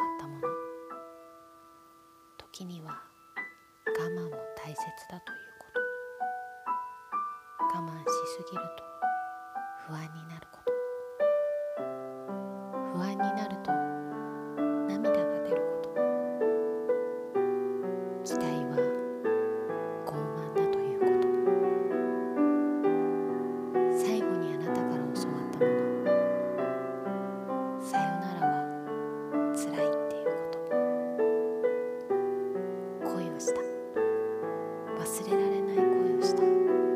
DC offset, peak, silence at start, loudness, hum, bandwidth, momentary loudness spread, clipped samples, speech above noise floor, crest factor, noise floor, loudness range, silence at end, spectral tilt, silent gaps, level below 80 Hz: under 0.1%; -14 dBFS; 0 s; -31 LUFS; none; 15.5 kHz; 13 LU; under 0.1%; 25 dB; 18 dB; -58 dBFS; 9 LU; 0 s; -6 dB/octave; none; -76 dBFS